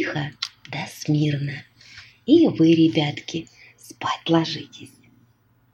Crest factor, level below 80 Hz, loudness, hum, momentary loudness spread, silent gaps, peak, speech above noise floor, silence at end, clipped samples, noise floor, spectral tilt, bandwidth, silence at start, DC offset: 18 dB; -64 dBFS; -22 LUFS; none; 16 LU; none; -4 dBFS; 39 dB; 0.85 s; under 0.1%; -60 dBFS; -6.5 dB/octave; 13 kHz; 0 s; under 0.1%